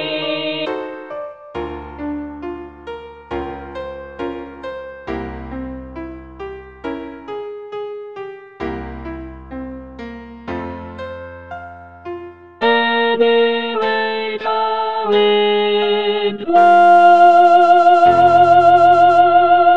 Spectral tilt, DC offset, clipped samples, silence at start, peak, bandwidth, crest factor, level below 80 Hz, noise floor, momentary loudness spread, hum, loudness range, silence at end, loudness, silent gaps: -6 dB/octave; under 0.1%; under 0.1%; 0 s; 0 dBFS; 7.2 kHz; 16 dB; -42 dBFS; -35 dBFS; 23 LU; none; 19 LU; 0 s; -12 LUFS; none